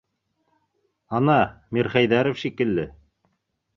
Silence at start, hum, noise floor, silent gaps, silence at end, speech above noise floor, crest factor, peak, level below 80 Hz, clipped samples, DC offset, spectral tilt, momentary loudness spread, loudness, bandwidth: 1.1 s; none; -74 dBFS; none; 0.85 s; 52 dB; 22 dB; -4 dBFS; -54 dBFS; under 0.1%; under 0.1%; -7.5 dB/octave; 9 LU; -22 LUFS; 7 kHz